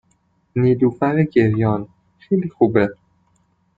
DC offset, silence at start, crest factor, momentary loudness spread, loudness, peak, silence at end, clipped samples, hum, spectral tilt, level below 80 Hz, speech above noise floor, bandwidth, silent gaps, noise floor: under 0.1%; 0.55 s; 18 dB; 8 LU; -18 LUFS; -2 dBFS; 0.85 s; under 0.1%; none; -10.5 dB/octave; -52 dBFS; 46 dB; 4.9 kHz; none; -63 dBFS